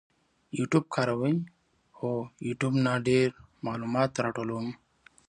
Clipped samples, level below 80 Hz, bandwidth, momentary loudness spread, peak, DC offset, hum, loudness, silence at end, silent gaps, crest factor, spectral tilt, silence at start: under 0.1%; -66 dBFS; 10.5 kHz; 13 LU; -10 dBFS; under 0.1%; none; -29 LUFS; 0.55 s; none; 20 dB; -6.5 dB/octave; 0.55 s